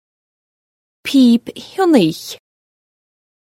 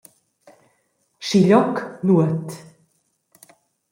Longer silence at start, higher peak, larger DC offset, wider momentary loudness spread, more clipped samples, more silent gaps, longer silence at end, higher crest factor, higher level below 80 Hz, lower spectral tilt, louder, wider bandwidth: second, 1.05 s vs 1.2 s; first, 0 dBFS vs -4 dBFS; neither; about the same, 18 LU vs 18 LU; neither; neither; second, 1.05 s vs 1.3 s; about the same, 18 dB vs 18 dB; about the same, -64 dBFS vs -66 dBFS; second, -5.5 dB/octave vs -7 dB/octave; first, -14 LUFS vs -19 LUFS; about the same, 16 kHz vs 15.5 kHz